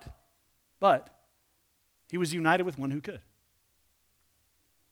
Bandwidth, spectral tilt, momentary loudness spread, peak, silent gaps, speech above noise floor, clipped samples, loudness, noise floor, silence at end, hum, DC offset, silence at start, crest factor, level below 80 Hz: over 20 kHz; -5.5 dB/octave; 18 LU; -10 dBFS; none; 43 dB; under 0.1%; -29 LUFS; -72 dBFS; 1.7 s; none; under 0.1%; 0.05 s; 22 dB; -64 dBFS